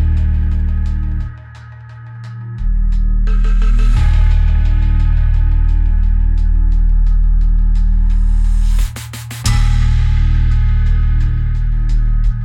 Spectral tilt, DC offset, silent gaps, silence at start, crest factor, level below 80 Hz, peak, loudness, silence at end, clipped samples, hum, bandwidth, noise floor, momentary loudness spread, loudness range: -6 dB/octave; under 0.1%; none; 0 s; 8 dB; -12 dBFS; -2 dBFS; -16 LUFS; 0 s; under 0.1%; none; 9.8 kHz; -33 dBFS; 12 LU; 4 LU